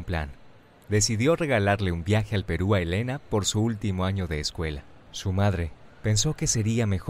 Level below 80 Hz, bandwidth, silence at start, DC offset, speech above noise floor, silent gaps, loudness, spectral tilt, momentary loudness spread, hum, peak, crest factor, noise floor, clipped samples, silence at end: -42 dBFS; 15 kHz; 0 s; under 0.1%; 26 dB; none; -26 LUFS; -5 dB/octave; 10 LU; none; -10 dBFS; 16 dB; -51 dBFS; under 0.1%; 0 s